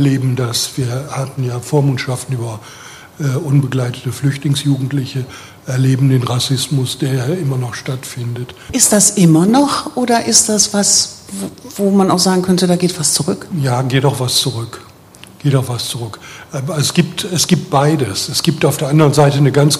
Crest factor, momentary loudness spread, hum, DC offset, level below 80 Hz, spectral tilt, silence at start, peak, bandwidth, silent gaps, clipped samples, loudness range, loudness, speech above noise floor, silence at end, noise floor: 14 dB; 14 LU; none; under 0.1%; -50 dBFS; -4.5 dB/octave; 0 s; 0 dBFS; 15.5 kHz; none; under 0.1%; 7 LU; -14 LUFS; 25 dB; 0 s; -40 dBFS